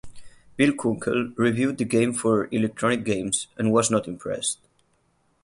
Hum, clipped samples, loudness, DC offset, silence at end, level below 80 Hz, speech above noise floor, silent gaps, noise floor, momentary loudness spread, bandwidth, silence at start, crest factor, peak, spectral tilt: none; under 0.1%; -24 LUFS; under 0.1%; 0.9 s; -58 dBFS; 43 dB; none; -67 dBFS; 6 LU; 11.5 kHz; 0.05 s; 18 dB; -6 dBFS; -4.5 dB/octave